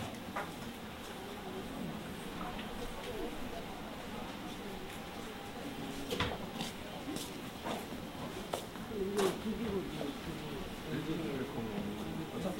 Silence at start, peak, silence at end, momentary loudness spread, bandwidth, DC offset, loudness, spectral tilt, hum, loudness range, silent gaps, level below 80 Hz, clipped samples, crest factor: 0 s; -18 dBFS; 0 s; 7 LU; 16 kHz; under 0.1%; -41 LUFS; -5 dB/octave; none; 5 LU; none; -54 dBFS; under 0.1%; 22 dB